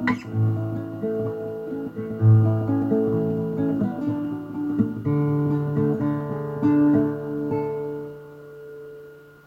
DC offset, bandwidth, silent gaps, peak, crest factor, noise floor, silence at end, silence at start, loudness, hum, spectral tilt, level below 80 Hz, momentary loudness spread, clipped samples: under 0.1%; 5.2 kHz; none; -8 dBFS; 16 dB; -45 dBFS; 0.15 s; 0 s; -24 LUFS; none; -10.5 dB/octave; -56 dBFS; 20 LU; under 0.1%